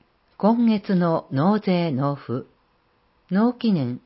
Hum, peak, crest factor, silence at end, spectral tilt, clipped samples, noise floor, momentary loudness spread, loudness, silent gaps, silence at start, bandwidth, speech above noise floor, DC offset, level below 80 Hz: none; -8 dBFS; 14 dB; 0.1 s; -12.5 dB/octave; under 0.1%; -64 dBFS; 7 LU; -22 LUFS; none; 0.4 s; 5.8 kHz; 43 dB; under 0.1%; -66 dBFS